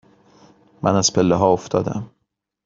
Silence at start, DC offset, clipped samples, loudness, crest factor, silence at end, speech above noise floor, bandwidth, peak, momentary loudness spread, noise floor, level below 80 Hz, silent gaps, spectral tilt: 0.8 s; under 0.1%; under 0.1%; -19 LUFS; 18 dB; 0.6 s; 57 dB; 7.8 kHz; -2 dBFS; 13 LU; -75 dBFS; -52 dBFS; none; -5 dB/octave